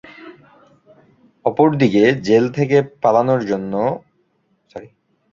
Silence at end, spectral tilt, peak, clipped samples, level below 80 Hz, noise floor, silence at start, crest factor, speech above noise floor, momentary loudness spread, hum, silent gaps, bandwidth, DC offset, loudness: 0.45 s; -7.5 dB/octave; 0 dBFS; under 0.1%; -58 dBFS; -64 dBFS; 0.2 s; 18 dB; 48 dB; 22 LU; none; none; 7.4 kHz; under 0.1%; -16 LUFS